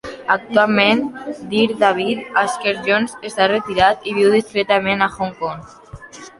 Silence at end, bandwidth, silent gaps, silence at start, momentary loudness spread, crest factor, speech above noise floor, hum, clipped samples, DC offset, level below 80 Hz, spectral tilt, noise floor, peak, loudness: 0.1 s; 11.5 kHz; none; 0.05 s; 12 LU; 16 dB; 20 dB; none; under 0.1%; under 0.1%; -50 dBFS; -4.5 dB/octave; -37 dBFS; -2 dBFS; -17 LUFS